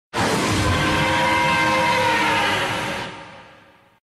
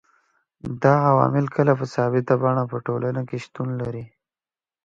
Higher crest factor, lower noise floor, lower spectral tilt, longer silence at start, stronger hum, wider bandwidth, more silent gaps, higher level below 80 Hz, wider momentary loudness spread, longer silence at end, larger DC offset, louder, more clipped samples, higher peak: second, 12 dB vs 22 dB; second, -51 dBFS vs under -90 dBFS; second, -4 dB/octave vs -9 dB/octave; second, 0.15 s vs 0.65 s; neither; first, 13.5 kHz vs 7.6 kHz; neither; first, -42 dBFS vs -60 dBFS; second, 9 LU vs 14 LU; about the same, 0.75 s vs 0.8 s; neither; first, -19 LUFS vs -22 LUFS; neither; second, -8 dBFS vs -2 dBFS